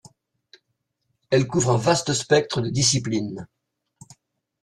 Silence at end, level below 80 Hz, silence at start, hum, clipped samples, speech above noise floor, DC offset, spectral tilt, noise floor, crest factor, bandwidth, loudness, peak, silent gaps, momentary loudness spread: 1.15 s; -56 dBFS; 1.3 s; none; under 0.1%; 55 dB; under 0.1%; -4 dB/octave; -76 dBFS; 20 dB; 12.5 kHz; -21 LUFS; -4 dBFS; none; 8 LU